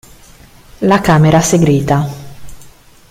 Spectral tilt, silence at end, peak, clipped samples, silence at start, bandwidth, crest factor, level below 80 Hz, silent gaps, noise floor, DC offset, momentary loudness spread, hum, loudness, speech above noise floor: -6 dB/octave; 0.4 s; 0 dBFS; under 0.1%; 0.8 s; 16 kHz; 14 dB; -38 dBFS; none; -40 dBFS; under 0.1%; 11 LU; none; -11 LUFS; 30 dB